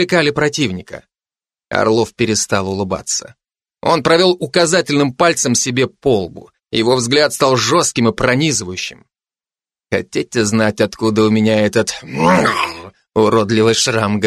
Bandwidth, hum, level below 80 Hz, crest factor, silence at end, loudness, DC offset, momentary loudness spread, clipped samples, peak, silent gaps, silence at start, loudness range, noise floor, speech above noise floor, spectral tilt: 13 kHz; none; -48 dBFS; 16 dB; 0 s; -15 LUFS; under 0.1%; 9 LU; under 0.1%; 0 dBFS; none; 0 s; 3 LU; under -90 dBFS; over 75 dB; -4 dB/octave